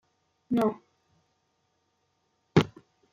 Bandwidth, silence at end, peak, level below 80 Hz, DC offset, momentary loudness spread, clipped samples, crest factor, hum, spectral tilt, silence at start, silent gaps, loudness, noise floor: 13.5 kHz; 0.45 s; -8 dBFS; -60 dBFS; under 0.1%; 9 LU; under 0.1%; 24 dB; none; -7 dB/octave; 0.5 s; none; -28 LUFS; -75 dBFS